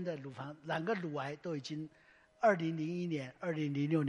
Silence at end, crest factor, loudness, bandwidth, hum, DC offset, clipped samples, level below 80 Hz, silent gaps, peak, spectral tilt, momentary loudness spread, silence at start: 0 s; 20 dB; -37 LUFS; 10.5 kHz; none; under 0.1%; under 0.1%; -80 dBFS; none; -16 dBFS; -7 dB/octave; 13 LU; 0 s